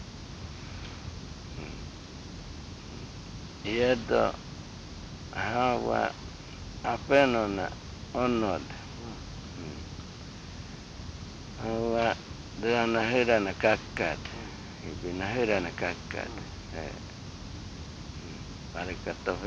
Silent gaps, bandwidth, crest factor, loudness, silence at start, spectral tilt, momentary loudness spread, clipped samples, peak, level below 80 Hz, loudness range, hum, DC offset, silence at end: none; 9.4 kHz; 22 dB; -30 LUFS; 0 s; -5.5 dB/octave; 17 LU; under 0.1%; -10 dBFS; -48 dBFS; 11 LU; none; under 0.1%; 0 s